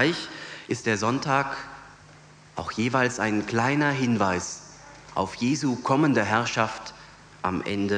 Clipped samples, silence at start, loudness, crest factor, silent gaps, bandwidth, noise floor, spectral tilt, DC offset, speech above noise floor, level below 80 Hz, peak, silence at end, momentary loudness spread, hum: under 0.1%; 0 s; -25 LUFS; 20 dB; none; 10 kHz; -50 dBFS; -5 dB/octave; under 0.1%; 26 dB; -58 dBFS; -6 dBFS; 0 s; 15 LU; none